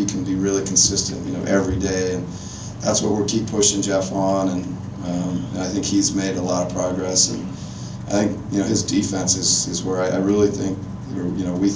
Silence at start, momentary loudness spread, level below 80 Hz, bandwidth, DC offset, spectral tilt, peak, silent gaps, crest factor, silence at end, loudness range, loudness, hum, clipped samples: 0 s; 12 LU; -42 dBFS; 8 kHz; under 0.1%; -4 dB/octave; -4 dBFS; none; 18 dB; 0 s; 2 LU; -20 LUFS; none; under 0.1%